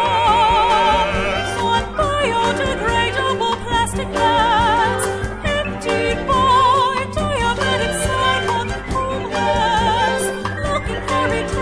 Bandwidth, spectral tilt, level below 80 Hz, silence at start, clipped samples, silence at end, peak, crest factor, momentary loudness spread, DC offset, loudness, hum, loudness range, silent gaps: 11 kHz; -4 dB/octave; -32 dBFS; 0 s; under 0.1%; 0 s; -4 dBFS; 14 dB; 8 LU; under 0.1%; -17 LUFS; none; 2 LU; none